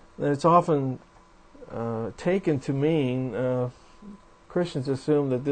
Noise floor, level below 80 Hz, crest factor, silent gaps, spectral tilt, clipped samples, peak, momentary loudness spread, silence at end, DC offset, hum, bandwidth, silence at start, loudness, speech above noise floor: -53 dBFS; -56 dBFS; 20 dB; none; -8 dB/octave; under 0.1%; -6 dBFS; 12 LU; 0 s; under 0.1%; none; 9.2 kHz; 0.2 s; -26 LUFS; 28 dB